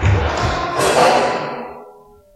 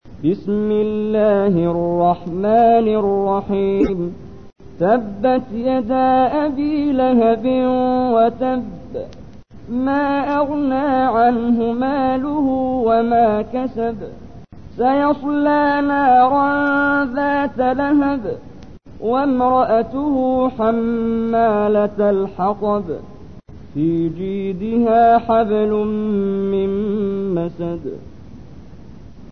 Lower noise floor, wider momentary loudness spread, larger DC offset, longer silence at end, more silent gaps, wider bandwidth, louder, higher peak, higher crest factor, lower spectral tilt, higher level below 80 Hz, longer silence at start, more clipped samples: first, -44 dBFS vs -39 dBFS; first, 15 LU vs 10 LU; second, under 0.1% vs 0.9%; first, 0.45 s vs 0 s; neither; first, 13 kHz vs 6.2 kHz; about the same, -16 LUFS vs -17 LUFS; first, 0 dBFS vs -4 dBFS; about the same, 18 dB vs 14 dB; second, -4.5 dB/octave vs -9 dB/octave; first, -30 dBFS vs -44 dBFS; about the same, 0 s vs 0 s; neither